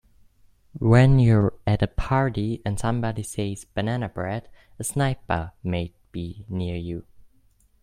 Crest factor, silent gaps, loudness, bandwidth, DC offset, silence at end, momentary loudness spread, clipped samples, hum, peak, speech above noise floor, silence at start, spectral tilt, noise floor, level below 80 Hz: 22 dB; none; -24 LUFS; 14 kHz; under 0.1%; 0.8 s; 16 LU; under 0.1%; none; -2 dBFS; 37 dB; 0.75 s; -7 dB/octave; -60 dBFS; -40 dBFS